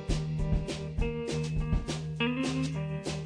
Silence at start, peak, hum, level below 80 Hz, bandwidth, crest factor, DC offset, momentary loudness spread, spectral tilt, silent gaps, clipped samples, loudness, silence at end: 0 s; -16 dBFS; none; -36 dBFS; 10.5 kHz; 14 dB; under 0.1%; 4 LU; -6 dB/octave; none; under 0.1%; -33 LUFS; 0 s